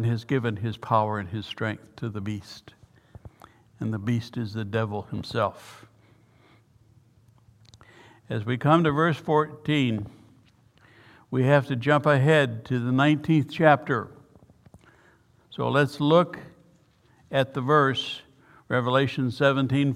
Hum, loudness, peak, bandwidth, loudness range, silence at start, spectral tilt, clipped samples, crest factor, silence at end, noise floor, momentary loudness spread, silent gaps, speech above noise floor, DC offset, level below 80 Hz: none; -25 LUFS; -2 dBFS; 12.5 kHz; 11 LU; 0 s; -7 dB/octave; under 0.1%; 24 dB; 0 s; -60 dBFS; 14 LU; none; 36 dB; under 0.1%; -62 dBFS